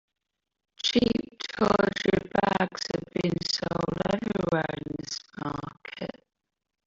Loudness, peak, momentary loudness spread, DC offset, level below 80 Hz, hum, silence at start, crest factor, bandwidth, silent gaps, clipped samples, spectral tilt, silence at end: -28 LUFS; -6 dBFS; 13 LU; under 0.1%; -54 dBFS; none; 0.85 s; 22 dB; 7.8 kHz; none; under 0.1%; -5 dB/octave; 0.8 s